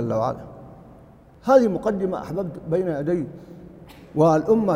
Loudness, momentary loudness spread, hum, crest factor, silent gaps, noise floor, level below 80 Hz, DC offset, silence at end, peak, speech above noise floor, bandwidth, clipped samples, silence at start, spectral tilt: -22 LUFS; 24 LU; none; 20 dB; none; -48 dBFS; -52 dBFS; under 0.1%; 0 s; -2 dBFS; 27 dB; 15 kHz; under 0.1%; 0 s; -8 dB/octave